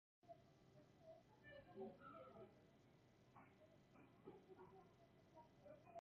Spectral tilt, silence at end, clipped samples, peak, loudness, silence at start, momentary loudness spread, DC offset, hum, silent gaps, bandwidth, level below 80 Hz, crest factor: -5.5 dB/octave; 0.1 s; under 0.1%; -44 dBFS; -65 LUFS; 0.25 s; 11 LU; under 0.1%; none; none; 7 kHz; -86 dBFS; 20 dB